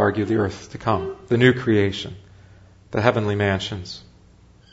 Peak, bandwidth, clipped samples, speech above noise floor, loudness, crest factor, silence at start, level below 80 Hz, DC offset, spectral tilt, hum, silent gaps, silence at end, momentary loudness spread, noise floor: 0 dBFS; 8 kHz; under 0.1%; 30 dB; -21 LUFS; 22 dB; 0 s; -50 dBFS; under 0.1%; -6.5 dB/octave; none; none; 0.7 s; 15 LU; -51 dBFS